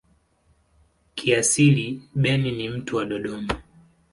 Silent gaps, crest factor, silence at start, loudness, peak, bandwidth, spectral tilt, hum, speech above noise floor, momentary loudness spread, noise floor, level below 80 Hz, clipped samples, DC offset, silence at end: none; 20 dB; 1.15 s; -23 LUFS; -4 dBFS; 11.5 kHz; -4.5 dB/octave; none; 41 dB; 13 LU; -63 dBFS; -50 dBFS; under 0.1%; under 0.1%; 0.5 s